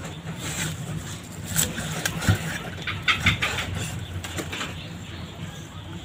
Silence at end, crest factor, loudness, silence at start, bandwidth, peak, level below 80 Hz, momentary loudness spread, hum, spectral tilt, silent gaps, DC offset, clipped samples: 0 s; 24 dB; -27 LUFS; 0 s; 16 kHz; -6 dBFS; -46 dBFS; 15 LU; none; -3 dB/octave; none; under 0.1%; under 0.1%